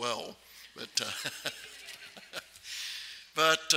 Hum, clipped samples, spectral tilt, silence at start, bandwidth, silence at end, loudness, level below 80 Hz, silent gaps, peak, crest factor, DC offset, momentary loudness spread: none; under 0.1%; -0.5 dB/octave; 0 s; 16 kHz; 0 s; -34 LUFS; -76 dBFS; none; -10 dBFS; 26 dB; under 0.1%; 18 LU